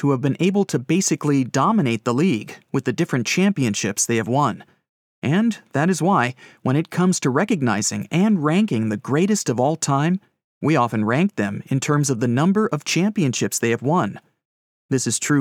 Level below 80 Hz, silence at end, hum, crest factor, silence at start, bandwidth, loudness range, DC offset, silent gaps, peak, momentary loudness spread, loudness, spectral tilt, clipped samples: -74 dBFS; 0 s; none; 16 dB; 0 s; 16.5 kHz; 1 LU; under 0.1%; 4.89-5.22 s, 10.44-10.61 s, 14.45-14.89 s; -4 dBFS; 5 LU; -20 LUFS; -5 dB/octave; under 0.1%